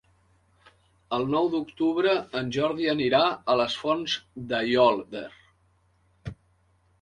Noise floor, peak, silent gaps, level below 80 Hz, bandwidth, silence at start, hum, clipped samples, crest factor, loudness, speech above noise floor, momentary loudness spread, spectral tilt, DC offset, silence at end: -66 dBFS; -8 dBFS; none; -60 dBFS; 10.5 kHz; 1.1 s; none; under 0.1%; 20 dB; -25 LUFS; 40 dB; 18 LU; -5.5 dB/octave; under 0.1%; 0.7 s